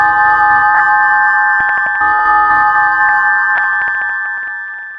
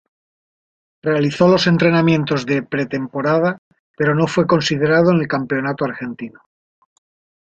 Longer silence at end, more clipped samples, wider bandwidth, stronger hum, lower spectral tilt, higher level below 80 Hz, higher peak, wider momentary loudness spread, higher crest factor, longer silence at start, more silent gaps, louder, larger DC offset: second, 0 s vs 1.15 s; neither; first, 9 kHz vs 8 kHz; neither; second, -4 dB/octave vs -6.5 dB/octave; about the same, -50 dBFS vs -54 dBFS; about the same, 0 dBFS vs -2 dBFS; second, 8 LU vs 11 LU; second, 10 dB vs 16 dB; second, 0 s vs 1.05 s; second, none vs 3.58-3.71 s, 3.79-3.94 s; first, -10 LUFS vs -17 LUFS; neither